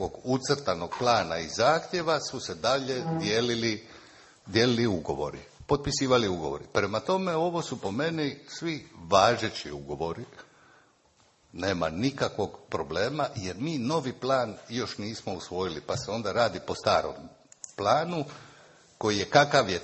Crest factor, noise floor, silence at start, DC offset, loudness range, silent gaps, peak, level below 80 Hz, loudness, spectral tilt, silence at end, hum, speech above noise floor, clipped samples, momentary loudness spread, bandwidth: 24 dB; -64 dBFS; 0 s; under 0.1%; 4 LU; none; -4 dBFS; -54 dBFS; -28 LUFS; -4.5 dB/octave; 0 s; none; 36 dB; under 0.1%; 11 LU; 8.6 kHz